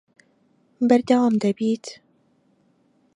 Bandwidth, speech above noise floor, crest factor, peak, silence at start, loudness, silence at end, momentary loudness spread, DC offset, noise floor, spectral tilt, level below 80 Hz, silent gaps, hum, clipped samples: 10.5 kHz; 43 dB; 20 dB; -4 dBFS; 0.8 s; -21 LUFS; 1.25 s; 11 LU; under 0.1%; -63 dBFS; -6.5 dB/octave; -70 dBFS; none; none; under 0.1%